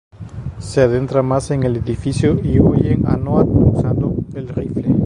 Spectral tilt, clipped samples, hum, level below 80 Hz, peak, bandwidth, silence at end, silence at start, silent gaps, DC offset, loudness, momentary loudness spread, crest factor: -8.5 dB/octave; under 0.1%; none; -30 dBFS; 0 dBFS; 11 kHz; 0 s; 0.15 s; none; under 0.1%; -16 LUFS; 11 LU; 16 dB